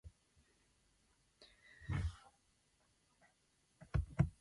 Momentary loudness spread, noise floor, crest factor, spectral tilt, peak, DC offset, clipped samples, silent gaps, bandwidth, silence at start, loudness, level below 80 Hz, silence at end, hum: 24 LU; -78 dBFS; 26 dB; -7.5 dB/octave; -20 dBFS; under 0.1%; under 0.1%; none; 11.5 kHz; 0.05 s; -42 LUFS; -52 dBFS; 0.1 s; none